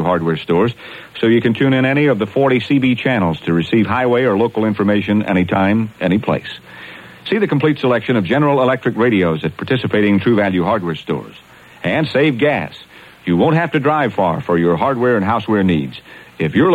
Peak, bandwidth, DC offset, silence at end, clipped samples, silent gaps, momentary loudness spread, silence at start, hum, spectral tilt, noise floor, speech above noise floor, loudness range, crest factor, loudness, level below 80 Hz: -2 dBFS; 13 kHz; under 0.1%; 0 s; under 0.1%; none; 9 LU; 0 s; none; -8 dB/octave; -36 dBFS; 21 dB; 2 LU; 14 dB; -16 LUFS; -52 dBFS